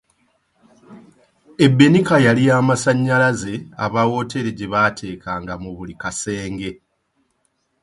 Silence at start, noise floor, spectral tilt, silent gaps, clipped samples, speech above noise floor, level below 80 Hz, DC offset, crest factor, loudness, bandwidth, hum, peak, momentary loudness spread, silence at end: 0.9 s; -68 dBFS; -6 dB/octave; none; under 0.1%; 51 dB; -50 dBFS; under 0.1%; 18 dB; -17 LUFS; 11.5 kHz; none; 0 dBFS; 17 LU; 1.1 s